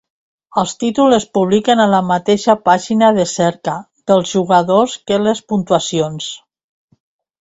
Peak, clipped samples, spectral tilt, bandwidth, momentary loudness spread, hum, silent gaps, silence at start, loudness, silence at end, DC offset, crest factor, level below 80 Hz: 0 dBFS; under 0.1%; -5 dB/octave; 8 kHz; 10 LU; none; none; 0.55 s; -14 LUFS; 1.05 s; under 0.1%; 14 dB; -54 dBFS